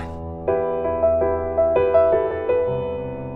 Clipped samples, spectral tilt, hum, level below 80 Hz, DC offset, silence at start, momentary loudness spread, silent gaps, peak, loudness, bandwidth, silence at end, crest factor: under 0.1%; -9.5 dB/octave; none; -40 dBFS; under 0.1%; 0 s; 11 LU; none; -6 dBFS; -20 LUFS; 4 kHz; 0 s; 14 dB